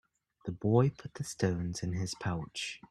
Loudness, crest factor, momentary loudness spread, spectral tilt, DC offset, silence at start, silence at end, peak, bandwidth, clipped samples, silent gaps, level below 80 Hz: -34 LUFS; 20 dB; 14 LU; -6 dB/octave; under 0.1%; 0.45 s; 0.15 s; -12 dBFS; 13 kHz; under 0.1%; none; -60 dBFS